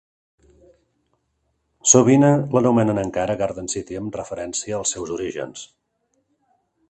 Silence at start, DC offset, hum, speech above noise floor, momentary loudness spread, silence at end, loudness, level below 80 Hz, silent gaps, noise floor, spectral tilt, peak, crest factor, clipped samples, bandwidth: 1.85 s; under 0.1%; none; 51 dB; 16 LU; 1.25 s; -20 LUFS; -54 dBFS; none; -71 dBFS; -5 dB/octave; 0 dBFS; 22 dB; under 0.1%; 9 kHz